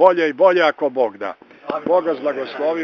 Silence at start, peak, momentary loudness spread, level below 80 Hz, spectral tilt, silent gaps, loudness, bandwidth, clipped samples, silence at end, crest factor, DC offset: 0 s; 0 dBFS; 15 LU; -70 dBFS; -2 dB/octave; none; -18 LUFS; 6.4 kHz; under 0.1%; 0 s; 18 dB; under 0.1%